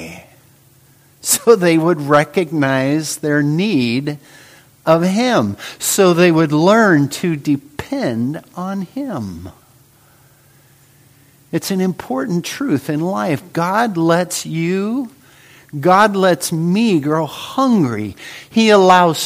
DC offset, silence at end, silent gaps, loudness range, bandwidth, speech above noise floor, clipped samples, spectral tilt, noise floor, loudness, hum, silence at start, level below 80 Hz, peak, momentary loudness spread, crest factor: under 0.1%; 0 s; none; 11 LU; 15.5 kHz; 35 dB; under 0.1%; -5 dB/octave; -50 dBFS; -15 LUFS; none; 0 s; -56 dBFS; 0 dBFS; 13 LU; 16 dB